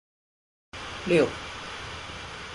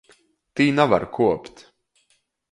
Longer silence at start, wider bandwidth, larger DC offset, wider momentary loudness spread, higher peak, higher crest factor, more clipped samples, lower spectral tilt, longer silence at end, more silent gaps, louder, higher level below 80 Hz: first, 0.75 s vs 0.55 s; about the same, 11.5 kHz vs 11 kHz; neither; first, 15 LU vs 11 LU; second, -10 dBFS vs -2 dBFS; about the same, 22 dB vs 22 dB; neither; second, -5 dB/octave vs -6.5 dB/octave; second, 0 s vs 1.05 s; neither; second, -29 LUFS vs -20 LUFS; about the same, -52 dBFS vs -56 dBFS